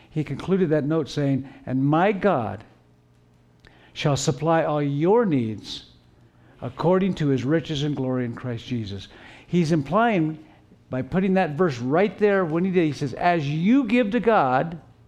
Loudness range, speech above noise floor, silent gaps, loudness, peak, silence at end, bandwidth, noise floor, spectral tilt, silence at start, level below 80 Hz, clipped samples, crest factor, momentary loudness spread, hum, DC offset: 4 LU; 35 dB; none; -23 LUFS; -6 dBFS; 0.3 s; 11 kHz; -57 dBFS; -7 dB/octave; 0.15 s; -54 dBFS; under 0.1%; 16 dB; 12 LU; none; under 0.1%